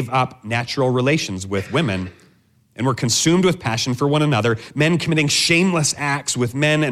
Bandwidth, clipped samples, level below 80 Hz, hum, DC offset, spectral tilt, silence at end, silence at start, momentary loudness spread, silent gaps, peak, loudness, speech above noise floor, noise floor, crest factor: 15 kHz; under 0.1%; -54 dBFS; none; under 0.1%; -4.5 dB/octave; 0 s; 0 s; 8 LU; none; -4 dBFS; -18 LUFS; 38 dB; -57 dBFS; 16 dB